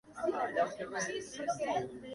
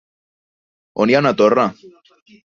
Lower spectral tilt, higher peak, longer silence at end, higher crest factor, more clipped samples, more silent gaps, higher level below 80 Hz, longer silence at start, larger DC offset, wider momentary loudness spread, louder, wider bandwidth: second, -3.5 dB/octave vs -6.5 dB/octave; second, -20 dBFS vs -2 dBFS; second, 0 s vs 0.8 s; about the same, 16 dB vs 18 dB; neither; neither; second, -70 dBFS vs -62 dBFS; second, 0.05 s vs 0.95 s; neither; second, 5 LU vs 8 LU; second, -36 LUFS vs -15 LUFS; first, 11.5 kHz vs 7.4 kHz